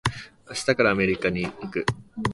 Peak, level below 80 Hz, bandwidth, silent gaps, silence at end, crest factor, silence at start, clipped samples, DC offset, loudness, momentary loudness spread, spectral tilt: -6 dBFS; -48 dBFS; 11.5 kHz; none; 0 s; 20 dB; 0.05 s; under 0.1%; under 0.1%; -25 LUFS; 10 LU; -5 dB/octave